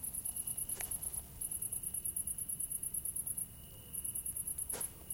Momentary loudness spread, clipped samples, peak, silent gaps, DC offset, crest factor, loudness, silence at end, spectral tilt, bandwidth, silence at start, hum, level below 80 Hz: 4 LU; under 0.1%; -24 dBFS; none; under 0.1%; 18 dB; -38 LUFS; 0 s; -1.5 dB/octave; 17 kHz; 0 s; none; -60 dBFS